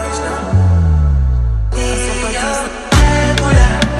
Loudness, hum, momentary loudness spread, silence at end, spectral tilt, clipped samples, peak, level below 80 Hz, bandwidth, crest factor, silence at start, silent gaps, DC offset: -14 LUFS; none; 7 LU; 0 s; -5 dB/octave; under 0.1%; 0 dBFS; -16 dBFS; 12.5 kHz; 12 dB; 0 s; none; under 0.1%